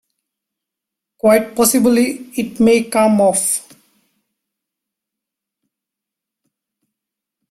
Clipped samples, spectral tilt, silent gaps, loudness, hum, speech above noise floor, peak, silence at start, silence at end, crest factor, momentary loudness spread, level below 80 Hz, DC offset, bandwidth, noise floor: under 0.1%; -4 dB/octave; none; -14 LUFS; none; 70 dB; 0 dBFS; 1.25 s; 3.9 s; 18 dB; 8 LU; -58 dBFS; under 0.1%; 16 kHz; -84 dBFS